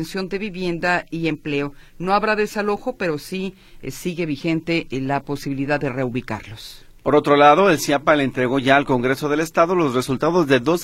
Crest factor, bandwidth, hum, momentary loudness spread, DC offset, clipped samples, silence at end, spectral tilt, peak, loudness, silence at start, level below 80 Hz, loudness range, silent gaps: 20 dB; 16 kHz; none; 13 LU; under 0.1%; under 0.1%; 0 s; -5.5 dB/octave; 0 dBFS; -20 LUFS; 0 s; -46 dBFS; 8 LU; none